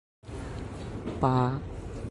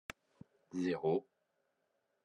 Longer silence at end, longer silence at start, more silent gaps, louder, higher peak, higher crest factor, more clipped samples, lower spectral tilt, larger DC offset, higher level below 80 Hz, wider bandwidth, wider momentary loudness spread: second, 0 s vs 1.05 s; second, 0.25 s vs 0.75 s; neither; first, -31 LUFS vs -38 LUFS; first, -10 dBFS vs -24 dBFS; about the same, 20 dB vs 18 dB; neither; first, -8 dB/octave vs -6.5 dB/octave; neither; first, -44 dBFS vs -78 dBFS; about the same, 11.5 kHz vs 10.5 kHz; second, 14 LU vs 18 LU